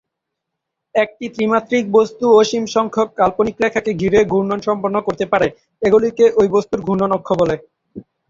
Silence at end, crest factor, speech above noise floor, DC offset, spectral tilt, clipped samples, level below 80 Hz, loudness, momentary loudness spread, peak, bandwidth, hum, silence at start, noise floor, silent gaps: 0.3 s; 16 dB; 63 dB; under 0.1%; -6 dB/octave; under 0.1%; -50 dBFS; -16 LUFS; 7 LU; -2 dBFS; 7.6 kHz; none; 0.95 s; -79 dBFS; none